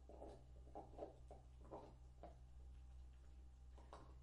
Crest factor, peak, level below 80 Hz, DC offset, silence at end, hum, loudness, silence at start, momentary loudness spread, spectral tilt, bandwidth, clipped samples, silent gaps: 20 dB; -38 dBFS; -62 dBFS; under 0.1%; 0 s; none; -62 LUFS; 0 s; 6 LU; -7.5 dB/octave; 10.5 kHz; under 0.1%; none